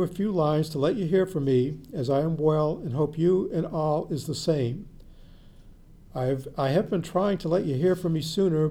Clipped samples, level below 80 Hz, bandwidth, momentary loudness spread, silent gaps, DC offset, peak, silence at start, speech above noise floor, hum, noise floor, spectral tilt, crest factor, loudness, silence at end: under 0.1%; -50 dBFS; 16 kHz; 5 LU; none; under 0.1%; -12 dBFS; 0 s; 24 dB; none; -49 dBFS; -7.5 dB/octave; 14 dB; -26 LUFS; 0 s